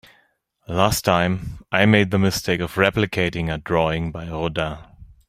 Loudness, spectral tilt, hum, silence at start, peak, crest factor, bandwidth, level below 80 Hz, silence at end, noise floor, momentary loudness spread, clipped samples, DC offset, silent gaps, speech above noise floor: -21 LUFS; -5 dB/octave; none; 0.7 s; -2 dBFS; 20 dB; 16 kHz; -42 dBFS; 0.15 s; -63 dBFS; 11 LU; under 0.1%; under 0.1%; none; 43 dB